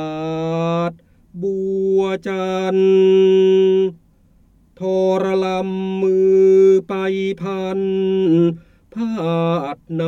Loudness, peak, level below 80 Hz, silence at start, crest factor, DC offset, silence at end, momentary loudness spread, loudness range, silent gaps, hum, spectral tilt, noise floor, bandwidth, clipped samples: -17 LUFS; -4 dBFS; -56 dBFS; 0 s; 12 dB; under 0.1%; 0 s; 12 LU; 2 LU; none; none; -8 dB/octave; -53 dBFS; 7.2 kHz; under 0.1%